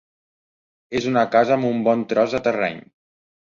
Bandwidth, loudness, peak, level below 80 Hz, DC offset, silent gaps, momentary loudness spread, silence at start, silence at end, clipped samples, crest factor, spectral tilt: 7.4 kHz; -20 LUFS; -4 dBFS; -60 dBFS; under 0.1%; none; 9 LU; 0.9 s; 0.8 s; under 0.1%; 18 dB; -6 dB/octave